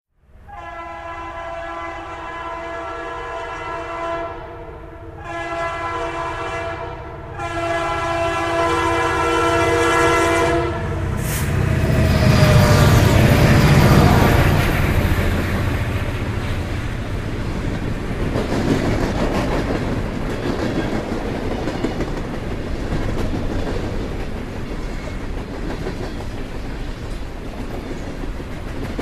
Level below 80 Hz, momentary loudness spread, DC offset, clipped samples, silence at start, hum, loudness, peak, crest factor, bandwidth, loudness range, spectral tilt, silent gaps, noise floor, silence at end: -28 dBFS; 17 LU; 0.1%; under 0.1%; 0.4 s; none; -20 LUFS; -2 dBFS; 18 dB; 15 kHz; 15 LU; -6 dB/octave; none; -44 dBFS; 0 s